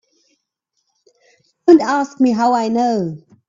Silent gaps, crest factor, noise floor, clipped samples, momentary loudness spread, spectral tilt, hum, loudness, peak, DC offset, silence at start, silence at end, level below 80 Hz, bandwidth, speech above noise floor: none; 18 dB; -72 dBFS; under 0.1%; 8 LU; -6 dB/octave; none; -15 LUFS; 0 dBFS; under 0.1%; 1.65 s; 0.3 s; -64 dBFS; 7.6 kHz; 58 dB